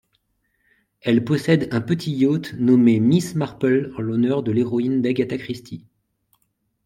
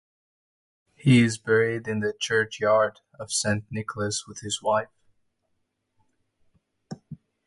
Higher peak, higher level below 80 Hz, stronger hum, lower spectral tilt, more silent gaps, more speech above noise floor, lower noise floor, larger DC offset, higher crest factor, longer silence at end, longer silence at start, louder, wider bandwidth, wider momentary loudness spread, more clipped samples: first, -4 dBFS vs -8 dBFS; about the same, -60 dBFS vs -62 dBFS; neither; first, -7.5 dB/octave vs -4.5 dB/octave; neither; about the same, 51 dB vs 51 dB; second, -70 dBFS vs -75 dBFS; neither; about the same, 18 dB vs 20 dB; first, 1.05 s vs 0.35 s; about the same, 1.05 s vs 1.05 s; first, -20 LUFS vs -25 LUFS; first, 13.5 kHz vs 11.5 kHz; second, 13 LU vs 22 LU; neither